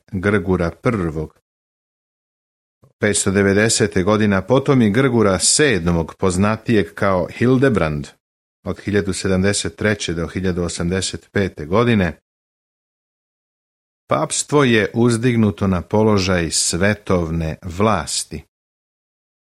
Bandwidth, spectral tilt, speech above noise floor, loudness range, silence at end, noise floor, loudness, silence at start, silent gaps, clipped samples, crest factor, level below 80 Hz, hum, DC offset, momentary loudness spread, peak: 14.5 kHz; -4.5 dB/octave; over 73 dB; 6 LU; 1.1 s; under -90 dBFS; -17 LUFS; 0.1 s; 1.42-2.81 s, 2.93-2.99 s, 8.20-8.63 s, 12.22-14.07 s; under 0.1%; 18 dB; -42 dBFS; none; under 0.1%; 8 LU; -2 dBFS